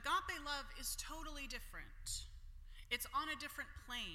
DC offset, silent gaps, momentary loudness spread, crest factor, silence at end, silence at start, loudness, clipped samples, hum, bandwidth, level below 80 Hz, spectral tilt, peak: under 0.1%; none; 15 LU; 22 dB; 0 s; 0 s; -45 LUFS; under 0.1%; none; 16.5 kHz; -54 dBFS; -1 dB/octave; -24 dBFS